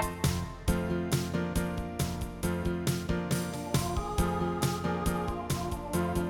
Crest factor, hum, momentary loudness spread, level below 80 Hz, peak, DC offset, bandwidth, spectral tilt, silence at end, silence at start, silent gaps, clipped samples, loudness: 16 dB; none; 3 LU; -40 dBFS; -14 dBFS; under 0.1%; 18 kHz; -5.5 dB/octave; 0 s; 0 s; none; under 0.1%; -32 LUFS